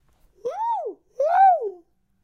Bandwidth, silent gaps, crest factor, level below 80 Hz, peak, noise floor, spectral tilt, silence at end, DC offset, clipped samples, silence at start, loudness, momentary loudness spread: 6.4 kHz; none; 16 dB; -68 dBFS; -8 dBFS; -53 dBFS; -4 dB/octave; 0.45 s; under 0.1%; under 0.1%; 0.45 s; -21 LUFS; 17 LU